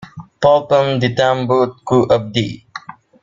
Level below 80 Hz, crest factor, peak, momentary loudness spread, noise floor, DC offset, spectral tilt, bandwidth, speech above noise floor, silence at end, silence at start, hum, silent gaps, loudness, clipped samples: -50 dBFS; 16 dB; 0 dBFS; 14 LU; -35 dBFS; under 0.1%; -6.5 dB/octave; 7.6 kHz; 20 dB; 0.3 s; 0 s; none; none; -15 LUFS; under 0.1%